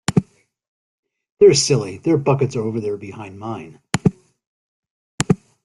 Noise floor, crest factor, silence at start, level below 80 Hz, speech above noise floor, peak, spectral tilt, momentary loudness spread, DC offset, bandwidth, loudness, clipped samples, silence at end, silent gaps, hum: -40 dBFS; 20 dB; 0.1 s; -50 dBFS; 22 dB; 0 dBFS; -5 dB/octave; 18 LU; under 0.1%; 12 kHz; -18 LUFS; under 0.1%; 0.3 s; 0.68-1.03 s, 1.32-1.37 s, 4.47-4.83 s, 4.90-5.18 s; none